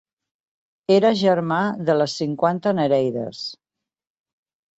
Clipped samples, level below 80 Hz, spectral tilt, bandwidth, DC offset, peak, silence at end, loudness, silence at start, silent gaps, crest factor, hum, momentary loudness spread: under 0.1%; -66 dBFS; -6 dB/octave; 8 kHz; under 0.1%; -4 dBFS; 1.25 s; -20 LUFS; 0.9 s; none; 18 dB; none; 13 LU